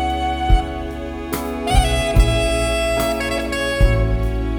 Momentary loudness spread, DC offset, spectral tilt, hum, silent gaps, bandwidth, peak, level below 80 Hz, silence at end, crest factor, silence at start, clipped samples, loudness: 9 LU; under 0.1%; -5 dB/octave; none; none; 19.5 kHz; -2 dBFS; -20 dBFS; 0 s; 16 dB; 0 s; under 0.1%; -19 LUFS